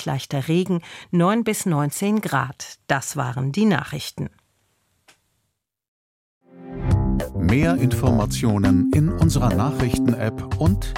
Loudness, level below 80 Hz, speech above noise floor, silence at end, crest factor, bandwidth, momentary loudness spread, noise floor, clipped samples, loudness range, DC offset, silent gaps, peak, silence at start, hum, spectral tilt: -21 LUFS; -34 dBFS; 55 dB; 0 s; 18 dB; 16.5 kHz; 10 LU; -75 dBFS; under 0.1%; 9 LU; under 0.1%; 5.88-6.41 s; -4 dBFS; 0 s; none; -6 dB/octave